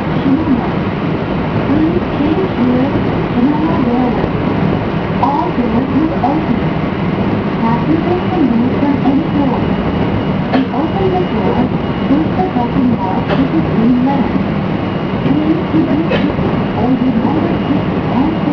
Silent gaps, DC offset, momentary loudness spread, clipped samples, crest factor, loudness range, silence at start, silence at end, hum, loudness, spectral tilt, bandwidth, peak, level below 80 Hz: none; under 0.1%; 3 LU; under 0.1%; 14 dB; 1 LU; 0 s; 0 s; none; -14 LUFS; -9.5 dB/octave; 5.4 kHz; 0 dBFS; -32 dBFS